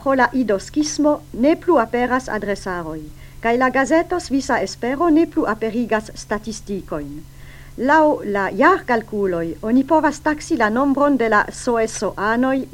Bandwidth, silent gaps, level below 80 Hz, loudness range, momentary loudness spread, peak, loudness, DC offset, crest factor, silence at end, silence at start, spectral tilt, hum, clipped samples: 16.5 kHz; none; -42 dBFS; 3 LU; 11 LU; 0 dBFS; -19 LUFS; under 0.1%; 18 dB; 0 s; 0 s; -5 dB/octave; none; under 0.1%